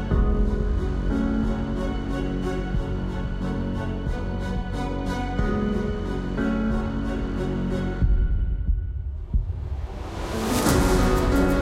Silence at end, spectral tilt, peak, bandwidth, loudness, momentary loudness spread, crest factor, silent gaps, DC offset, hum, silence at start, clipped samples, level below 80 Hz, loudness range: 0 s; -6.5 dB/octave; -6 dBFS; 16 kHz; -26 LUFS; 8 LU; 18 dB; none; under 0.1%; none; 0 s; under 0.1%; -26 dBFS; 3 LU